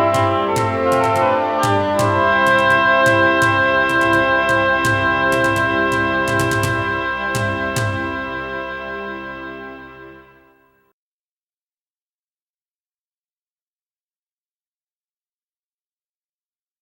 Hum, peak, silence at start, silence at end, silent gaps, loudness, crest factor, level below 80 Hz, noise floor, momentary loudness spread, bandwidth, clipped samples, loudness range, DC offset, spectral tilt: none; -2 dBFS; 0 s; 6.6 s; none; -16 LUFS; 16 dB; -46 dBFS; under -90 dBFS; 14 LU; 19 kHz; under 0.1%; 16 LU; under 0.1%; -5 dB/octave